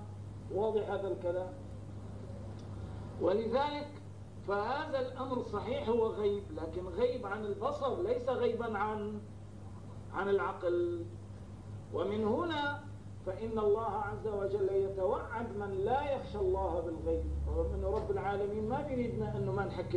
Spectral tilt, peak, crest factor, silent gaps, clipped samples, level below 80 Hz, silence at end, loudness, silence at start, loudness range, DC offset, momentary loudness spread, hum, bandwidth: -7.5 dB/octave; -18 dBFS; 16 dB; none; under 0.1%; -48 dBFS; 0 s; -35 LUFS; 0 s; 3 LU; 0.1%; 14 LU; none; 10.5 kHz